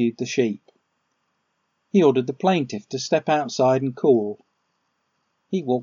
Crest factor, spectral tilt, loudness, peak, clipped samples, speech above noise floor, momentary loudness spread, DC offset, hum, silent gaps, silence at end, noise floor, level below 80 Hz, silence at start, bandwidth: 18 dB; -5.5 dB/octave; -22 LUFS; -4 dBFS; under 0.1%; 52 dB; 11 LU; under 0.1%; none; none; 0 s; -73 dBFS; -76 dBFS; 0 s; 7.4 kHz